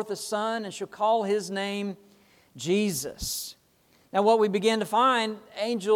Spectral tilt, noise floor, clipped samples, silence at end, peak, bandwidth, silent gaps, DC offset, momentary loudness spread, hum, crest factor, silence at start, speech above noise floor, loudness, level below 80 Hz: -4 dB/octave; -63 dBFS; under 0.1%; 0 s; -8 dBFS; 18 kHz; none; under 0.1%; 12 LU; none; 18 dB; 0 s; 37 dB; -27 LUFS; -58 dBFS